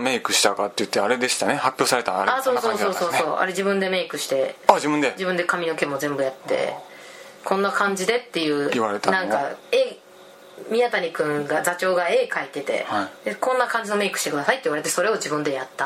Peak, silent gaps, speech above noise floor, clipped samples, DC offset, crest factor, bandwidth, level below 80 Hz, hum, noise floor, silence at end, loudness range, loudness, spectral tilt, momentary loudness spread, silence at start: 0 dBFS; none; 24 dB; under 0.1%; under 0.1%; 22 dB; 16 kHz; -74 dBFS; none; -46 dBFS; 0 s; 3 LU; -22 LUFS; -3 dB/octave; 6 LU; 0 s